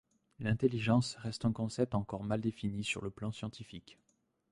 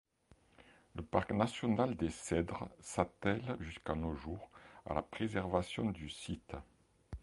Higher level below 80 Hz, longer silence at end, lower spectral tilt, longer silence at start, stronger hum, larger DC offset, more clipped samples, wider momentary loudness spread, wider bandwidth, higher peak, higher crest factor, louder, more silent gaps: second, -60 dBFS vs -54 dBFS; first, 0.6 s vs 0 s; about the same, -6 dB/octave vs -6 dB/octave; second, 0.4 s vs 0.95 s; neither; neither; neither; about the same, 13 LU vs 15 LU; about the same, 11.5 kHz vs 11.5 kHz; about the same, -16 dBFS vs -14 dBFS; about the same, 20 dB vs 24 dB; first, -35 LUFS vs -39 LUFS; neither